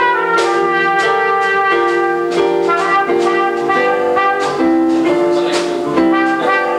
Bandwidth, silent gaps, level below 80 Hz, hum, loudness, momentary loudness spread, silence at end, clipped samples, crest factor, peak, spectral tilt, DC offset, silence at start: 11.5 kHz; none; -54 dBFS; none; -13 LUFS; 2 LU; 0 s; under 0.1%; 12 dB; -2 dBFS; -4.5 dB/octave; under 0.1%; 0 s